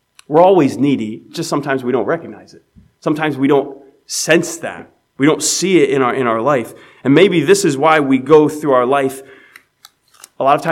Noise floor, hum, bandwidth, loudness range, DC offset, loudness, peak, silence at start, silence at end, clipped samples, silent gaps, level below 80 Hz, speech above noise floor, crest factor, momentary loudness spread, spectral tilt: -49 dBFS; none; 16.5 kHz; 6 LU; under 0.1%; -14 LUFS; 0 dBFS; 0.3 s; 0 s; under 0.1%; none; -64 dBFS; 35 dB; 14 dB; 14 LU; -4.5 dB/octave